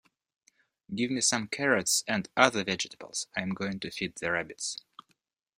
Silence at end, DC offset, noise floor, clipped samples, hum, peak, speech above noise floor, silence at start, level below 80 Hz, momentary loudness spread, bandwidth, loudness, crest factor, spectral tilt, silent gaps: 0.85 s; under 0.1%; -75 dBFS; under 0.1%; none; -4 dBFS; 45 dB; 0.9 s; -68 dBFS; 11 LU; 16 kHz; -29 LUFS; 28 dB; -2.5 dB/octave; none